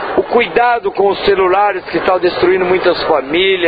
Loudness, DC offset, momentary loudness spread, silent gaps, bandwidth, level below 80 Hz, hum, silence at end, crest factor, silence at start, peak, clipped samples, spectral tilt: -13 LUFS; under 0.1%; 3 LU; none; 5 kHz; -42 dBFS; none; 0 s; 12 dB; 0 s; 0 dBFS; under 0.1%; -7.5 dB/octave